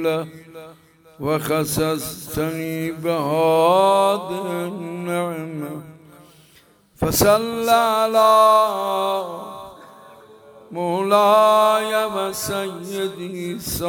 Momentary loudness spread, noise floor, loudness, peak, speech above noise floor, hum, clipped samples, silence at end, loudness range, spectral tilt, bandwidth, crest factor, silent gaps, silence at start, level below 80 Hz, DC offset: 16 LU; -54 dBFS; -19 LUFS; -2 dBFS; 34 dB; none; under 0.1%; 0 s; 6 LU; -4.5 dB/octave; over 20 kHz; 18 dB; none; 0 s; -50 dBFS; under 0.1%